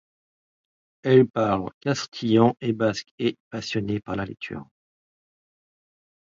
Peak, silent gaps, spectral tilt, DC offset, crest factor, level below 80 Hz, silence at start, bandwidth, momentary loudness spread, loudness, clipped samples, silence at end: -4 dBFS; 1.74-1.81 s, 2.08-2.12 s, 3.11-3.18 s, 3.40-3.51 s; -6.5 dB/octave; under 0.1%; 22 dB; -58 dBFS; 1.05 s; 7.6 kHz; 14 LU; -24 LUFS; under 0.1%; 1.7 s